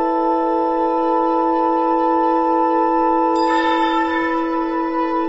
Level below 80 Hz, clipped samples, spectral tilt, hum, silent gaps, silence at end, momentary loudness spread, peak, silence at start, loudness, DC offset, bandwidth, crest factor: -48 dBFS; under 0.1%; -5 dB/octave; none; none; 0 s; 3 LU; -6 dBFS; 0 s; -17 LUFS; under 0.1%; 7.8 kHz; 12 dB